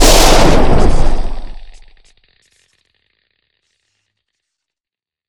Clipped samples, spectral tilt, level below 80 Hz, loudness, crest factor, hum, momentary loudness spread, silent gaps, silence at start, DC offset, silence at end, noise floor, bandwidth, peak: 1%; -3.5 dB/octave; -16 dBFS; -12 LUFS; 12 dB; none; 23 LU; none; 0 s; under 0.1%; 3.65 s; -89 dBFS; 19 kHz; 0 dBFS